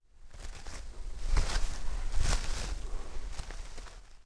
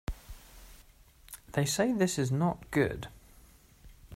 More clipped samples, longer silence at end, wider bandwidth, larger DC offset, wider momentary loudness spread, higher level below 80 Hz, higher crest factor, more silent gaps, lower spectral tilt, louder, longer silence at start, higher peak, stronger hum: neither; about the same, 0.05 s vs 0 s; second, 11 kHz vs 16 kHz; neither; second, 15 LU vs 22 LU; first, -34 dBFS vs -50 dBFS; about the same, 18 dB vs 20 dB; neither; second, -3.5 dB/octave vs -5 dB/octave; second, -39 LUFS vs -30 LUFS; about the same, 0.2 s vs 0.1 s; about the same, -14 dBFS vs -14 dBFS; neither